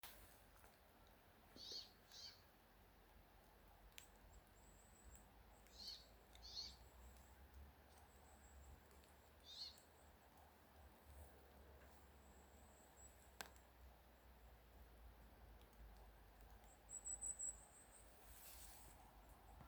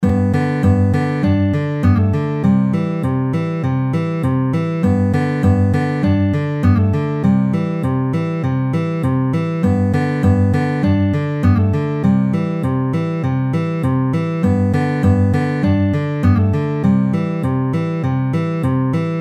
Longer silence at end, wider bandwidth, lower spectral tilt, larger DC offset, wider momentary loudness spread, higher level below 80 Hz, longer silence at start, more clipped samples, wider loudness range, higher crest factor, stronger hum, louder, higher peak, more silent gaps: about the same, 0 s vs 0 s; first, over 20 kHz vs 8.6 kHz; second, -1.5 dB/octave vs -9 dB/octave; neither; first, 15 LU vs 4 LU; second, -70 dBFS vs -40 dBFS; about the same, 0 s vs 0 s; neither; first, 12 LU vs 1 LU; first, 36 dB vs 14 dB; neither; second, -60 LUFS vs -17 LUFS; second, -26 dBFS vs -2 dBFS; neither